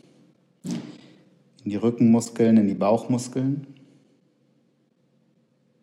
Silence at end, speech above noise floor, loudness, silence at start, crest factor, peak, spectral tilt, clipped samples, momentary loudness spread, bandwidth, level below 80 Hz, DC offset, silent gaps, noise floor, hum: 2.1 s; 45 dB; -23 LUFS; 0.65 s; 18 dB; -8 dBFS; -7 dB/octave; under 0.1%; 16 LU; 12 kHz; -74 dBFS; under 0.1%; none; -66 dBFS; none